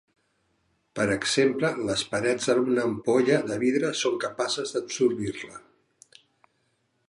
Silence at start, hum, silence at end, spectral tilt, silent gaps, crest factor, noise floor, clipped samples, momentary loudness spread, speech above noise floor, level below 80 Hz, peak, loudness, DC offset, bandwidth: 0.95 s; none; 1.5 s; -4 dB/octave; none; 18 dB; -72 dBFS; under 0.1%; 8 LU; 47 dB; -62 dBFS; -8 dBFS; -25 LUFS; under 0.1%; 11.5 kHz